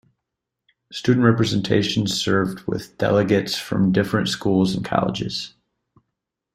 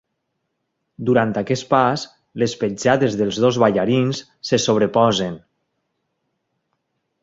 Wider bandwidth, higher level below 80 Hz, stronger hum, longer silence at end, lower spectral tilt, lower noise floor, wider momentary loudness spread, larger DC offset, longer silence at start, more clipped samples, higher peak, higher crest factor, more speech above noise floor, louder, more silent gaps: first, 13.5 kHz vs 7.8 kHz; about the same, -52 dBFS vs -56 dBFS; neither; second, 1.05 s vs 1.85 s; about the same, -5.5 dB/octave vs -5.5 dB/octave; first, -82 dBFS vs -75 dBFS; about the same, 10 LU vs 11 LU; neither; about the same, 0.9 s vs 1 s; neither; about the same, -2 dBFS vs -2 dBFS; about the same, 20 dB vs 18 dB; first, 62 dB vs 57 dB; about the same, -21 LUFS vs -19 LUFS; neither